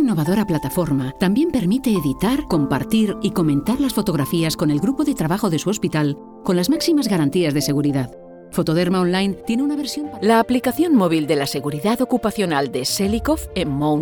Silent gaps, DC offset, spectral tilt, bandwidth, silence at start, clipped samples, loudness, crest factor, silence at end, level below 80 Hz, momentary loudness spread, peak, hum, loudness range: none; under 0.1%; -5.5 dB/octave; 19.5 kHz; 0 s; under 0.1%; -19 LUFS; 14 dB; 0 s; -42 dBFS; 5 LU; -4 dBFS; none; 1 LU